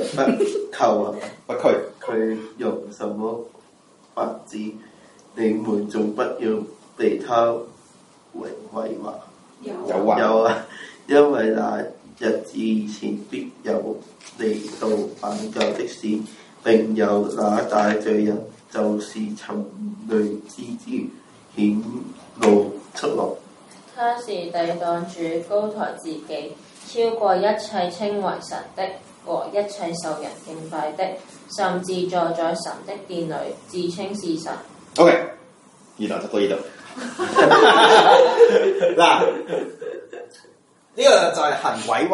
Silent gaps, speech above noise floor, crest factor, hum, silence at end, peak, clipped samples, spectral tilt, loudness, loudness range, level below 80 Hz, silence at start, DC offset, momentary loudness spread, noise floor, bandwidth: none; 33 dB; 20 dB; none; 0 s; 0 dBFS; under 0.1%; -4.5 dB/octave; -21 LUFS; 11 LU; -70 dBFS; 0 s; under 0.1%; 19 LU; -53 dBFS; 11.5 kHz